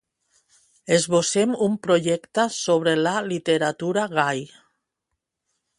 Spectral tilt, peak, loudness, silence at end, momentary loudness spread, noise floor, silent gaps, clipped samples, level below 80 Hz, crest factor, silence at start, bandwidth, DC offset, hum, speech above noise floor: -4 dB/octave; -4 dBFS; -22 LUFS; 1.3 s; 5 LU; -81 dBFS; none; under 0.1%; -68 dBFS; 18 dB; 0.85 s; 11.5 kHz; under 0.1%; none; 59 dB